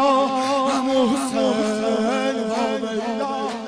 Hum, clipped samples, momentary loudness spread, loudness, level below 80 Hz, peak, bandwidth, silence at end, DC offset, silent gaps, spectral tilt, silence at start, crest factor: none; under 0.1%; 5 LU; -21 LUFS; -60 dBFS; -8 dBFS; 11 kHz; 0 s; under 0.1%; none; -4 dB/octave; 0 s; 12 dB